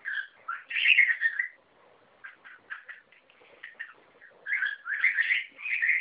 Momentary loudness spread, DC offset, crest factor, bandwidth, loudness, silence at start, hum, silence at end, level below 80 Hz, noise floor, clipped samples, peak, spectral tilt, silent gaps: 26 LU; under 0.1%; 24 dB; 4 kHz; -25 LUFS; 0.05 s; none; 0 s; -88 dBFS; -61 dBFS; under 0.1%; -8 dBFS; 6.5 dB/octave; none